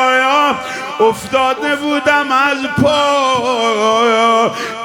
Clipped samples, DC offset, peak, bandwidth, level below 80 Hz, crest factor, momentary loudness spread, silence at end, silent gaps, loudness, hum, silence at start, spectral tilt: under 0.1%; under 0.1%; 0 dBFS; 18.5 kHz; -52 dBFS; 12 dB; 5 LU; 0 s; none; -13 LUFS; none; 0 s; -3.5 dB/octave